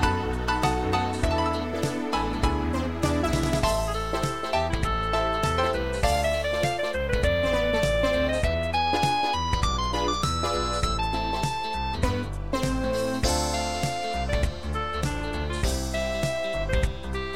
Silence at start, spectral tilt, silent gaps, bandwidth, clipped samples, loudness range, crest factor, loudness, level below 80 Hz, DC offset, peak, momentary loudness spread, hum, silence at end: 0 s; -5 dB/octave; none; 16 kHz; under 0.1%; 3 LU; 16 dB; -26 LUFS; -32 dBFS; 0.9%; -8 dBFS; 5 LU; none; 0 s